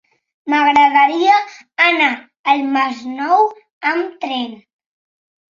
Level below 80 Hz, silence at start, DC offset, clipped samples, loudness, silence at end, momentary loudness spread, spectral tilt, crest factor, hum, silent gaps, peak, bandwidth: -68 dBFS; 0.45 s; under 0.1%; under 0.1%; -15 LUFS; 0.95 s; 12 LU; -2.5 dB/octave; 16 dB; none; 2.39-2.44 s, 3.72-3.81 s; -2 dBFS; 7.4 kHz